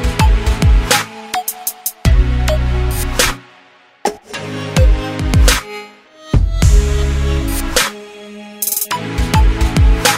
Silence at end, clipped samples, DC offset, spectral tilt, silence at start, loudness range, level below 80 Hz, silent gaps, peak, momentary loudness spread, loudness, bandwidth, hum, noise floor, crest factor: 0 s; under 0.1%; under 0.1%; -4 dB/octave; 0 s; 2 LU; -16 dBFS; none; 0 dBFS; 11 LU; -15 LUFS; 16.5 kHz; none; -46 dBFS; 14 dB